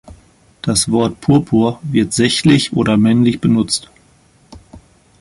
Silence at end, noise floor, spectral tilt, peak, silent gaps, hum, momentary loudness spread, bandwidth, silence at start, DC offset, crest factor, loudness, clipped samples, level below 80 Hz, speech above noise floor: 0.45 s; -51 dBFS; -5 dB/octave; -2 dBFS; none; none; 5 LU; 11.5 kHz; 0.1 s; under 0.1%; 14 dB; -14 LUFS; under 0.1%; -44 dBFS; 37 dB